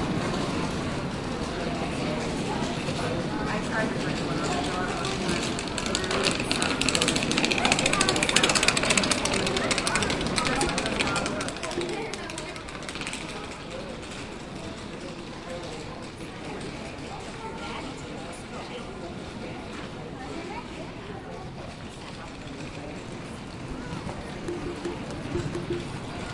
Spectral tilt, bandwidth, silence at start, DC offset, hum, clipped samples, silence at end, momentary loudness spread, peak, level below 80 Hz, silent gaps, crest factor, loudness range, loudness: -3.5 dB/octave; 11.5 kHz; 0 s; under 0.1%; none; under 0.1%; 0 s; 16 LU; -2 dBFS; -46 dBFS; none; 28 dB; 15 LU; -28 LUFS